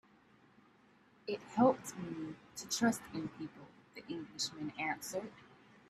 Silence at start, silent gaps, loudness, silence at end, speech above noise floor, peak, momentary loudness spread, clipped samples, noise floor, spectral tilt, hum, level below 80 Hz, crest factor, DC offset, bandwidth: 1.25 s; none; -38 LUFS; 0.35 s; 29 dB; -16 dBFS; 19 LU; under 0.1%; -67 dBFS; -4 dB/octave; none; -74 dBFS; 22 dB; under 0.1%; 14 kHz